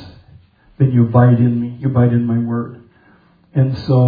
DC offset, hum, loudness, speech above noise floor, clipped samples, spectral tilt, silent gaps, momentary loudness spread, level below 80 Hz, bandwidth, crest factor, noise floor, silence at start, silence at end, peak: under 0.1%; none; -15 LUFS; 37 dB; under 0.1%; -11.5 dB/octave; none; 11 LU; -48 dBFS; 5 kHz; 14 dB; -51 dBFS; 0 s; 0 s; 0 dBFS